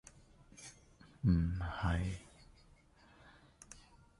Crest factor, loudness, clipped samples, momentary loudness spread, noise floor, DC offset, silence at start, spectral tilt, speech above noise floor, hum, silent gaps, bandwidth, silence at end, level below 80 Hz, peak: 20 dB; -37 LUFS; under 0.1%; 27 LU; -65 dBFS; under 0.1%; 0.6 s; -6.5 dB/octave; 31 dB; none; none; 11.5 kHz; 0.45 s; -48 dBFS; -20 dBFS